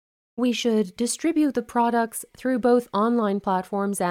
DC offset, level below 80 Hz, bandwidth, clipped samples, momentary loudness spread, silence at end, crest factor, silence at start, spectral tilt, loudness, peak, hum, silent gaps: under 0.1%; -64 dBFS; 16 kHz; under 0.1%; 6 LU; 0 s; 16 dB; 0.35 s; -4.5 dB/octave; -23 LUFS; -8 dBFS; none; none